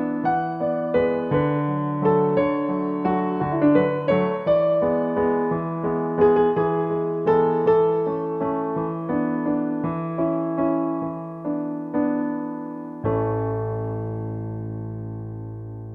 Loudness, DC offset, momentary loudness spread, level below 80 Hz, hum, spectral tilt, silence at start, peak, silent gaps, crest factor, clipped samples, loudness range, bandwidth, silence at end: -23 LUFS; under 0.1%; 12 LU; -52 dBFS; none; -10.5 dB/octave; 0 s; -6 dBFS; none; 16 dB; under 0.1%; 6 LU; 4.9 kHz; 0 s